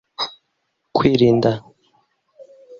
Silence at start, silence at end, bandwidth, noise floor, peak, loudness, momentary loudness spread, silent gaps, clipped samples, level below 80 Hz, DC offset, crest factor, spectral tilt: 0.2 s; 0.05 s; 7 kHz; -72 dBFS; -2 dBFS; -18 LUFS; 13 LU; none; under 0.1%; -52 dBFS; under 0.1%; 18 dB; -7.5 dB/octave